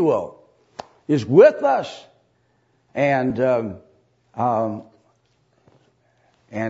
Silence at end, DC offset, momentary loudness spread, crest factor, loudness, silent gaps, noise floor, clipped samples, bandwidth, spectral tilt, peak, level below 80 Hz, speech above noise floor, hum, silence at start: 0 s; under 0.1%; 27 LU; 20 dB; -19 LUFS; none; -64 dBFS; under 0.1%; 8 kHz; -7.5 dB/octave; 0 dBFS; -64 dBFS; 46 dB; none; 0 s